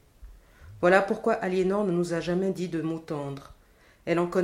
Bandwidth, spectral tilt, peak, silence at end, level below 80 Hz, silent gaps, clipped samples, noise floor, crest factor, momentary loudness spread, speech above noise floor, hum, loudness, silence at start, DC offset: 14 kHz; -6.5 dB/octave; -6 dBFS; 0 s; -56 dBFS; none; under 0.1%; -58 dBFS; 22 dB; 12 LU; 32 dB; none; -27 LUFS; 0.2 s; under 0.1%